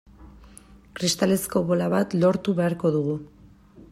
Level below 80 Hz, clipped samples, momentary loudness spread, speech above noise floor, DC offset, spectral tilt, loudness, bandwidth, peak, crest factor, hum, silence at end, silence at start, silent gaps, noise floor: -54 dBFS; under 0.1%; 7 LU; 27 dB; under 0.1%; -5.5 dB/octave; -24 LUFS; 16 kHz; -8 dBFS; 16 dB; none; 0.1 s; 0.2 s; none; -50 dBFS